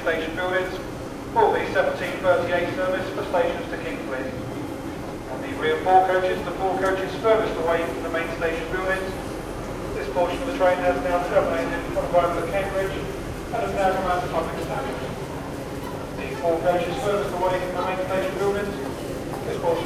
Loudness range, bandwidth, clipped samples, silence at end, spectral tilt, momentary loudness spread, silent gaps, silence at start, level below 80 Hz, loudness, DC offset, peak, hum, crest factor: 4 LU; 15.5 kHz; under 0.1%; 0 s; -5.5 dB/octave; 11 LU; none; 0 s; -42 dBFS; -24 LUFS; under 0.1%; -4 dBFS; none; 20 dB